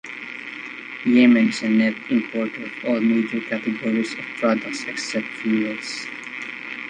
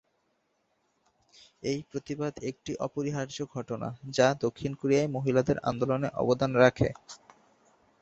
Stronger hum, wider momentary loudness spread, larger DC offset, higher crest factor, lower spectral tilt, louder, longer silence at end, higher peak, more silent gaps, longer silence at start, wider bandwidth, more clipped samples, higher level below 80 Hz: neither; about the same, 15 LU vs 13 LU; neither; second, 18 dB vs 24 dB; about the same, -5 dB/octave vs -6 dB/octave; first, -22 LUFS vs -29 LUFS; second, 0 s vs 0.85 s; about the same, -4 dBFS vs -6 dBFS; neither; second, 0.05 s vs 1.65 s; first, 9.8 kHz vs 8.2 kHz; neither; second, -68 dBFS vs -58 dBFS